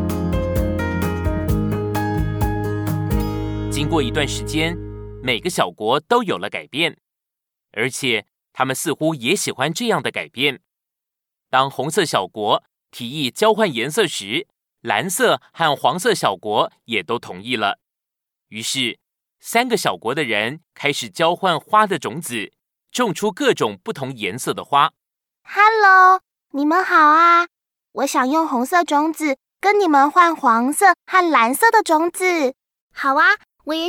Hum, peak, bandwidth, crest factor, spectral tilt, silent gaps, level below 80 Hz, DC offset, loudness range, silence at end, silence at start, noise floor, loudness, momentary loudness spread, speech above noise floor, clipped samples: none; -2 dBFS; over 20 kHz; 18 dB; -4 dB/octave; 32.82-32.90 s; -38 dBFS; under 0.1%; 7 LU; 0 s; 0 s; -85 dBFS; -18 LUFS; 11 LU; 67 dB; under 0.1%